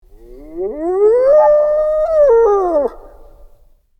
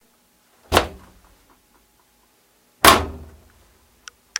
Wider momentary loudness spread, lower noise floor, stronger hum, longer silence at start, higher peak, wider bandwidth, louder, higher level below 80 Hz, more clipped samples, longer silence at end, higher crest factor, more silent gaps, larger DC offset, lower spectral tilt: second, 13 LU vs 20 LU; second, -48 dBFS vs -60 dBFS; neither; second, 0.3 s vs 0.7 s; about the same, -2 dBFS vs 0 dBFS; second, 6.4 kHz vs 16.5 kHz; first, -13 LUFS vs -16 LUFS; about the same, -40 dBFS vs -40 dBFS; neither; second, 0.55 s vs 1.15 s; second, 12 dB vs 24 dB; neither; neither; first, -7 dB/octave vs -2.5 dB/octave